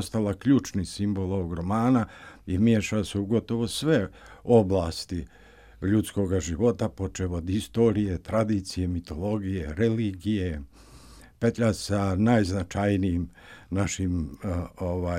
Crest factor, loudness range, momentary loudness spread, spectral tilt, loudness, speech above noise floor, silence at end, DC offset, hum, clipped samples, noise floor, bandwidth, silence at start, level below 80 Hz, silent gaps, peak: 20 dB; 3 LU; 10 LU; -6.5 dB/octave; -27 LUFS; 24 dB; 0 s; under 0.1%; none; under 0.1%; -50 dBFS; 15.5 kHz; 0 s; -48 dBFS; none; -6 dBFS